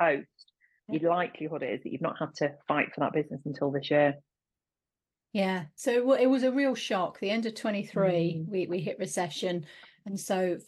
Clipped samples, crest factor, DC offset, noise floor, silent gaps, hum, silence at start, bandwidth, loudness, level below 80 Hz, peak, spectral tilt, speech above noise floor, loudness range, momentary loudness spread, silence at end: under 0.1%; 18 dB; under 0.1%; under -90 dBFS; none; none; 0 s; 12.5 kHz; -30 LUFS; -78 dBFS; -12 dBFS; -5.5 dB/octave; over 61 dB; 3 LU; 10 LU; 0.05 s